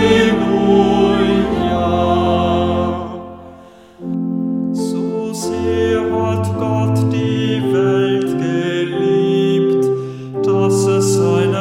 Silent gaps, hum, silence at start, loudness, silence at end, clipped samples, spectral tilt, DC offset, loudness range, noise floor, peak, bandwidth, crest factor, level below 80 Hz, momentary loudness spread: none; none; 0 s; -16 LUFS; 0 s; under 0.1%; -6.5 dB/octave; under 0.1%; 5 LU; -40 dBFS; 0 dBFS; 14.5 kHz; 16 dB; -40 dBFS; 8 LU